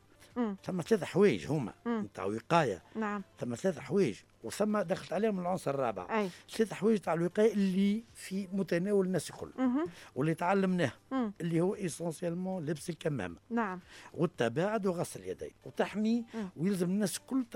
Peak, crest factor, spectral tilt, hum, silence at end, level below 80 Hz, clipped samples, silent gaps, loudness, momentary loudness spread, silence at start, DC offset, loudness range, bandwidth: -12 dBFS; 22 dB; -6 dB/octave; none; 0 s; -70 dBFS; under 0.1%; none; -33 LUFS; 9 LU; 0.2 s; under 0.1%; 4 LU; 16 kHz